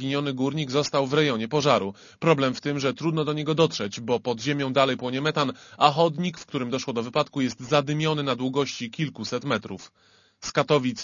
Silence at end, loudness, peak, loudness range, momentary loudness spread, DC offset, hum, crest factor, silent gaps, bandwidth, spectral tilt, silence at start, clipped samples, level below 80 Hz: 0 s; -25 LUFS; -2 dBFS; 3 LU; 8 LU; under 0.1%; none; 22 dB; none; 7.4 kHz; -5 dB/octave; 0 s; under 0.1%; -64 dBFS